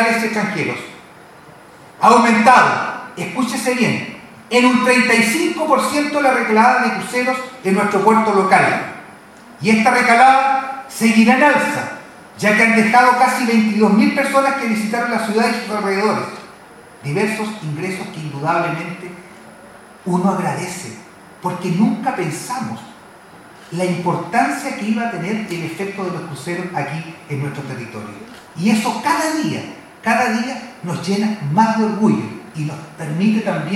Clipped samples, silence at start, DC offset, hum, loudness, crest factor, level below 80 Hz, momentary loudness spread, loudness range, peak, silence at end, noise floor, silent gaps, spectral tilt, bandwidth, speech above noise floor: under 0.1%; 0 s; under 0.1%; none; -16 LUFS; 18 dB; -62 dBFS; 17 LU; 9 LU; 0 dBFS; 0 s; -41 dBFS; none; -5 dB/octave; 15 kHz; 25 dB